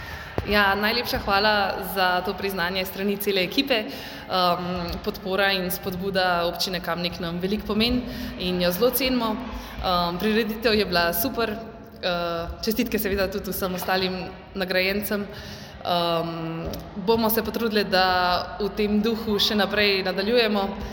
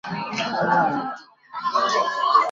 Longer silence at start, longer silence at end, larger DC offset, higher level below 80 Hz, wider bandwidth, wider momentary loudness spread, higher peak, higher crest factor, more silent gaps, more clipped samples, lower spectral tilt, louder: about the same, 0 s vs 0.05 s; about the same, 0 s vs 0 s; neither; first, -44 dBFS vs -66 dBFS; first, 17 kHz vs 7.6 kHz; second, 10 LU vs 14 LU; about the same, -4 dBFS vs -4 dBFS; about the same, 20 dB vs 18 dB; neither; neither; about the same, -4.5 dB/octave vs -4 dB/octave; about the same, -24 LUFS vs -22 LUFS